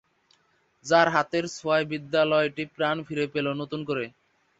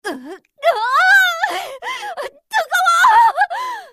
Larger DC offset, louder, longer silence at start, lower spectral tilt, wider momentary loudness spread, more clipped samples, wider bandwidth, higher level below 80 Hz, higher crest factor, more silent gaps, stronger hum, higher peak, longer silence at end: neither; second, -26 LUFS vs -14 LUFS; first, 0.85 s vs 0.05 s; first, -5 dB/octave vs 0.5 dB/octave; second, 10 LU vs 16 LU; neither; second, 8 kHz vs 15.5 kHz; about the same, -68 dBFS vs -64 dBFS; first, 22 dB vs 14 dB; neither; neither; second, -6 dBFS vs -2 dBFS; first, 0.5 s vs 0.05 s